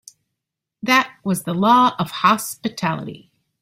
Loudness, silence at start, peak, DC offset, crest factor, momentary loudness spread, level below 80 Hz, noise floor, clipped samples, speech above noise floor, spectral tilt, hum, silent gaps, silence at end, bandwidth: -19 LUFS; 0.85 s; -2 dBFS; under 0.1%; 18 dB; 13 LU; -62 dBFS; -82 dBFS; under 0.1%; 63 dB; -4.5 dB/octave; none; none; 0.45 s; 16 kHz